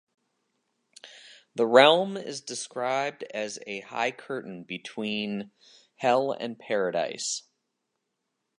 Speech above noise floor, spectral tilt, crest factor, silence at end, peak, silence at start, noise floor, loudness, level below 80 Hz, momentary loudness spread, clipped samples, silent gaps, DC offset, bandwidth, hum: 54 dB; -3 dB/octave; 26 dB; 1.2 s; -2 dBFS; 1.05 s; -81 dBFS; -27 LUFS; -80 dBFS; 17 LU; under 0.1%; none; under 0.1%; 11.5 kHz; none